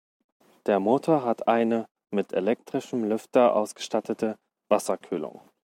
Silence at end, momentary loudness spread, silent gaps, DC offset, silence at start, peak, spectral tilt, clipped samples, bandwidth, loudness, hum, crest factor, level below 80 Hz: 0.35 s; 10 LU; 1.91-1.95 s; under 0.1%; 0.65 s; -6 dBFS; -5.5 dB/octave; under 0.1%; 16.5 kHz; -26 LUFS; none; 20 dB; -76 dBFS